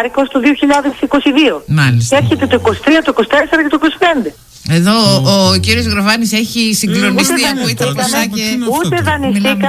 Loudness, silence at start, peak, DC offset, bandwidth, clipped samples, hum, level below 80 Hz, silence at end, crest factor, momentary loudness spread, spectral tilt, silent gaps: -11 LUFS; 0 s; 0 dBFS; under 0.1%; 16 kHz; under 0.1%; none; -34 dBFS; 0 s; 12 dB; 5 LU; -4.5 dB/octave; none